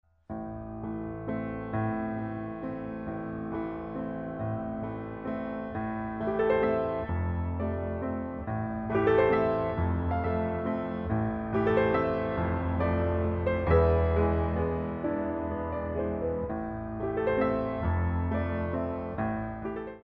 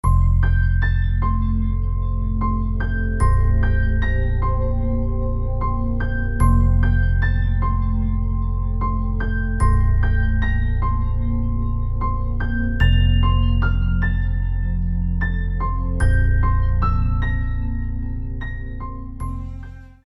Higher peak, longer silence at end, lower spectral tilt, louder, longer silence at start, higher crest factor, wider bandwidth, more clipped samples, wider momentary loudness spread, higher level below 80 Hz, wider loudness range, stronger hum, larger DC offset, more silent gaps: second, -12 dBFS vs -4 dBFS; second, 0.05 s vs 0.2 s; first, -11 dB/octave vs -8 dB/octave; second, -30 LUFS vs -22 LUFS; first, 0.3 s vs 0.05 s; about the same, 18 dB vs 14 dB; second, 4.6 kHz vs 11.5 kHz; neither; about the same, 11 LU vs 9 LU; second, -42 dBFS vs -20 dBFS; first, 7 LU vs 2 LU; neither; neither; neither